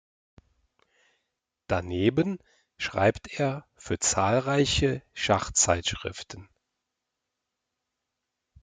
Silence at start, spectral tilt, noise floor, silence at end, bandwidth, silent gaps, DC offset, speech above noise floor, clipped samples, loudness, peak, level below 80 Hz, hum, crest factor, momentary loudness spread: 1.7 s; -3.5 dB/octave; -84 dBFS; 2.2 s; 9.6 kHz; none; under 0.1%; 57 dB; under 0.1%; -26 LUFS; -8 dBFS; -50 dBFS; none; 22 dB; 14 LU